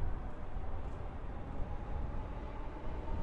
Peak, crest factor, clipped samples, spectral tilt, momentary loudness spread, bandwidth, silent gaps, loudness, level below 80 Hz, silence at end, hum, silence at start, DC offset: -24 dBFS; 14 dB; under 0.1%; -8.5 dB/octave; 3 LU; 4.7 kHz; none; -45 LUFS; -42 dBFS; 0 s; none; 0 s; under 0.1%